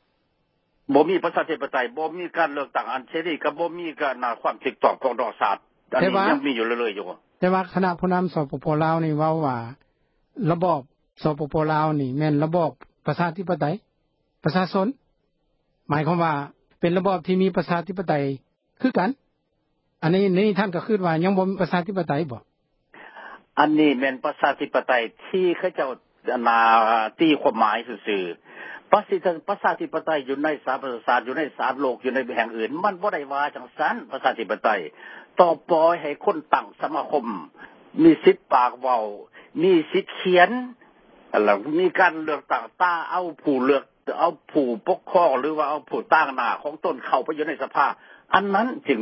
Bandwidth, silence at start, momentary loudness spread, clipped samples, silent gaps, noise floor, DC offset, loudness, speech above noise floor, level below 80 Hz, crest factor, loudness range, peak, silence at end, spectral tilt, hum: 5.8 kHz; 0.9 s; 9 LU; under 0.1%; none; -71 dBFS; under 0.1%; -23 LUFS; 49 dB; -64 dBFS; 22 dB; 4 LU; 0 dBFS; 0 s; -11 dB/octave; none